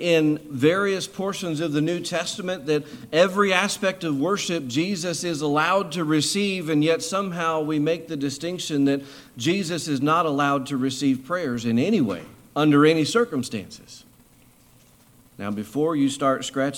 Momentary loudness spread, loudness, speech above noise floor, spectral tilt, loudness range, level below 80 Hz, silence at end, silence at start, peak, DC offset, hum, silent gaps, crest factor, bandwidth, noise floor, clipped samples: 9 LU; -23 LUFS; 32 dB; -5 dB/octave; 2 LU; -64 dBFS; 0 s; 0 s; -4 dBFS; under 0.1%; none; none; 20 dB; 16.5 kHz; -55 dBFS; under 0.1%